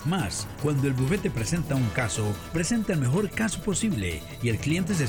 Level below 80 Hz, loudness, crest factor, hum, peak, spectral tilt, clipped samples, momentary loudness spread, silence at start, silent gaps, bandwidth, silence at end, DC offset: -44 dBFS; -27 LUFS; 16 dB; none; -10 dBFS; -5.5 dB/octave; under 0.1%; 4 LU; 0 s; none; 19.5 kHz; 0 s; under 0.1%